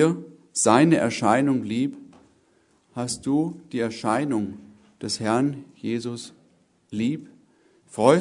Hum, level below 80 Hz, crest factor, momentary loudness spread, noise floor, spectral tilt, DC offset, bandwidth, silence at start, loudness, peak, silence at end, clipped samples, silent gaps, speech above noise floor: none; -66 dBFS; 22 dB; 17 LU; -63 dBFS; -5 dB/octave; under 0.1%; 11 kHz; 0 s; -24 LUFS; -2 dBFS; 0 s; under 0.1%; none; 40 dB